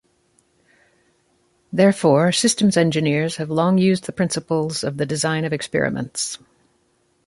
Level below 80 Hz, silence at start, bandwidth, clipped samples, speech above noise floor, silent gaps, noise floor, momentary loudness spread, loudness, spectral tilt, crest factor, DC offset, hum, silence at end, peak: -58 dBFS; 1.7 s; 11.5 kHz; under 0.1%; 45 dB; none; -64 dBFS; 9 LU; -19 LUFS; -5 dB/octave; 18 dB; under 0.1%; none; 0.9 s; -2 dBFS